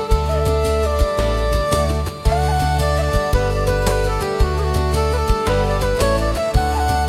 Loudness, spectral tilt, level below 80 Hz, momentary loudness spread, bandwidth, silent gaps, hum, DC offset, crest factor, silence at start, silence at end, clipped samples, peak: -19 LUFS; -5.5 dB/octave; -22 dBFS; 2 LU; 15.5 kHz; none; none; under 0.1%; 14 dB; 0 s; 0 s; under 0.1%; -2 dBFS